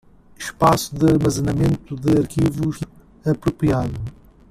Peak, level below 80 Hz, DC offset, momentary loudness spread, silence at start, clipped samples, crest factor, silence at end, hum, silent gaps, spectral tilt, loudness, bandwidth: -2 dBFS; -40 dBFS; under 0.1%; 15 LU; 0.4 s; under 0.1%; 18 dB; 0.4 s; none; none; -6.5 dB/octave; -20 LUFS; 15 kHz